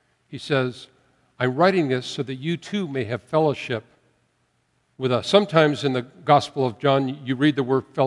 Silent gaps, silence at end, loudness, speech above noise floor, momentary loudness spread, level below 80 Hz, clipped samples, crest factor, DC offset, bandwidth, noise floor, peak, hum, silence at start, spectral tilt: none; 0 s; -22 LUFS; 46 dB; 10 LU; -68 dBFS; under 0.1%; 22 dB; under 0.1%; 11.5 kHz; -68 dBFS; -2 dBFS; none; 0.3 s; -6.5 dB/octave